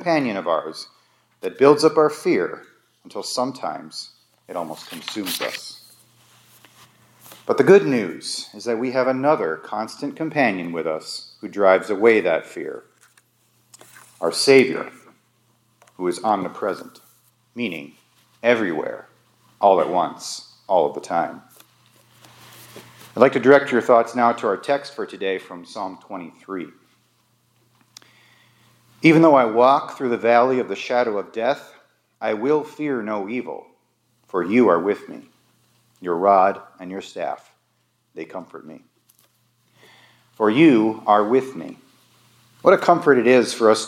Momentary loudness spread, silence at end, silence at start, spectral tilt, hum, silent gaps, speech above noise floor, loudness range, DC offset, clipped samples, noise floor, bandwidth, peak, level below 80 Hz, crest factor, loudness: 20 LU; 0 s; 0 s; -5 dB/octave; none; none; 48 dB; 11 LU; under 0.1%; under 0.1%; -67 dBFS; 17 kHz; 0 dBFS; -76 dBFS; 20 dB; -19 LUFS